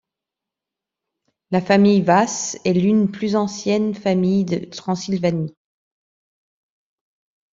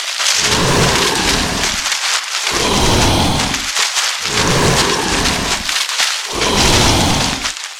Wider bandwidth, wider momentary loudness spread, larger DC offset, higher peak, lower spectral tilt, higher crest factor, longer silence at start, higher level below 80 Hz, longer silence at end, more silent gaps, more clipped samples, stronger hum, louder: second, 7.6 kHz vs 17.5 kHz; first, 11 LU vs 4 LU; neither; about the same, -2 dBFS vs 0 dBFS; first, -6 dB/octave vs -2.5 dB/octave; first, 20 dB vs 14 dB; first, 1.5 s vs 0 s; second, -60 dBFS vs -28 dBFS; first, 2.05 s vs 0 s; neither; neither; neither; second, -19 LUFS vs -13 LUFS